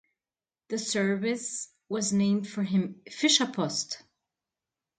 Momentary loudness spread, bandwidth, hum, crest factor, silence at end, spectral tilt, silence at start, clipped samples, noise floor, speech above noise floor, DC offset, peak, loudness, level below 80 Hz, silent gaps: 13 LU; 9.6 kHz; none; 20 dB; 1 s; -3.5 dB/octave; 0.7 s; under 0.1%; under -90 dBFS; over 62 dB; under 0.1%; -10 dBFS; -28 LUFS; -74 dBFS; none